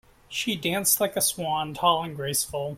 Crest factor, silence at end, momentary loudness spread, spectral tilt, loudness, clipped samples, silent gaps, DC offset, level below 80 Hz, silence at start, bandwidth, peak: 20 dB; 0 s; 7 LU; -2.5 dB/octave; -25 LUFS; under 0.1%; none; under 0.1%; -58 dBFS; 0.3 s; 16.5 kHz; -8 dBFS